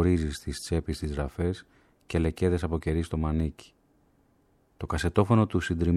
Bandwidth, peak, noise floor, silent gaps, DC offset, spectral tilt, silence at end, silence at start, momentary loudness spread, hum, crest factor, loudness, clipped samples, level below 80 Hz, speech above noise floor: 13 kHz; -8 dBFS; -66 dBFS; none; under 0.1%; -7 dB/octave; 0 s; 0 s; 10 LU; none; 20 dB; -29 LUFS; under 0.1%; -38 dBFS; 39 dB